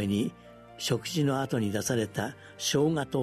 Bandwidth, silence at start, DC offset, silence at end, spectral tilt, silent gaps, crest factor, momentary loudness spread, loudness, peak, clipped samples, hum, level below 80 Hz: 13.5 kHz; 0 s; under 0.1%; 0 s; -5 dB/octave; none; 16 dB; 8 LU; -30 LUFS; -14 dBFS; under 0.1%; none; -62 dBFS